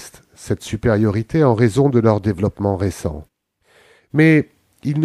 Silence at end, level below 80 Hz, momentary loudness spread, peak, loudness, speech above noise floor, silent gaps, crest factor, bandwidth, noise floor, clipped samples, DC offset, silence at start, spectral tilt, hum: 0 s; -42 dBFS; 14 LU; -2 dBFS; -17 LUFS; 41 dB; none; 16 dB; 13 kHz; -57 dBFS; under 0.1%; under 0.1%; 0 s; -7.5 dB/octave; none